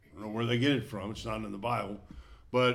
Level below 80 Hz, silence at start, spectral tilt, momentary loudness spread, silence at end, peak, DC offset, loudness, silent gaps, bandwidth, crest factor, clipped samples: -54 dBFS; 0.15 s; -6 dB/octave; 16 LU; 0 s; -14 dBFS; under 0.1%; -33 LUFS; none; 14 kHz; 18 dB; under 0.1%